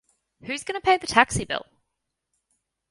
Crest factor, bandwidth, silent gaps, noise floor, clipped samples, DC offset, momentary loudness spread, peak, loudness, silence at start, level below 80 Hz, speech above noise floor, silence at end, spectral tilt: 26 dB; 11.5 kHz; none; -81 dBFS; under 0.1%; under 0.1%; 13 LU; 0 dBFS; -23 LUFS; 0.45 s; -50 dBFS; 58 dB; 1.3 s; -3 dB/octave